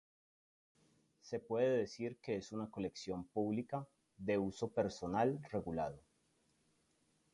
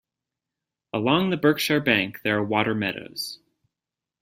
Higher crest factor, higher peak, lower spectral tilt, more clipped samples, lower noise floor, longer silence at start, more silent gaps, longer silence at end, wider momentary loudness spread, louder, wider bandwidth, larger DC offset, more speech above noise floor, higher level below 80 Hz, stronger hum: about the same, 18 dB vs 22 dB; second, -22 dBFS vs -4 dBFS; first, -6.5 dB/octave vs -5 dB/octave; neither; second, -78 dBFS vs -88 dBFS; first, 1.25 s vs 0.95 s; neither; first, 1.35 s vs 0.85 s; about the same, 10 LU vs 12 LU; second, -40 LUFS vs -23 LUFS; second, 11.5 kHz vs 16 kHz; neither; second, 38 dB vs 65 dB; second, -68 dBFS vs -62 dBFS; neither